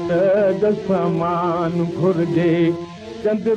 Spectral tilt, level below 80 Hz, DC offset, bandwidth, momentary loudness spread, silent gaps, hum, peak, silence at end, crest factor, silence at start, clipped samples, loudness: -8.5 dB/octave; -52 dBFS; under 0.1%; 8.4 kHz; 6 LU; none; none; -8 dBFS; 0 s; 12 dB; 0 s; under 0.1%; -19 LUFS